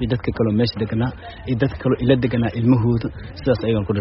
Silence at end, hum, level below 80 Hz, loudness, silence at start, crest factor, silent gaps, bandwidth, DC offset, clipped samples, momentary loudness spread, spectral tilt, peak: 0 s; none; -38 dBFS; -20 LUFS; 0 s; 18 dB; none; 5.8 kHz; under 0.1%; under 0.1%; 9 LU; -7 dB/octave; -2 dBFS